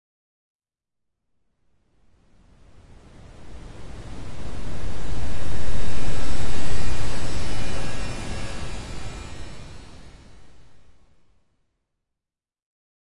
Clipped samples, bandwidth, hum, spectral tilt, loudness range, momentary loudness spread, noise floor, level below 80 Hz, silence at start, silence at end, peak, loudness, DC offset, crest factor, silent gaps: under 0.1%; 11.5 kHz; none; -5 dB/octave; 18 LU; 18 LU; -89 dBFS; -38 dBFS; 0.55 s; 0.3 s; -6 dBFS; -34 LUFS; under 0.1%; 10 dB; 0.55-0.59 s, 12.62-12.66 s